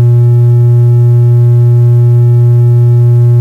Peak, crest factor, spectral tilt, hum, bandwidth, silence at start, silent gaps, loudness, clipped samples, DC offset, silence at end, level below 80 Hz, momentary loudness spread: -2 dBFS; 2 dB; -11 dB/octave; none; 1.9 kHz; 0 s; none; -6 LUFS; under 0.1%; under 0.1%; 0 s; -42 dBFS; 0 LU